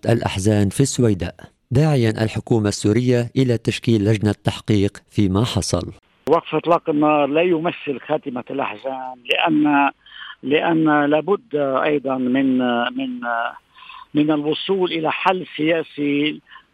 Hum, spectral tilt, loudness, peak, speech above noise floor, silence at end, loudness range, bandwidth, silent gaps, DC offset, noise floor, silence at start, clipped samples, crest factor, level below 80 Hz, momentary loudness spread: none; -6 dB/octave; -19 LUFS; -2 dBFS; 23 dB; 0.15 s; 2 LU; 13.5 kHz; none; under 0.1%; -42 dBFS; 0.05 s; under 0.1%; 16 dB; -50 dBFS; 9 LU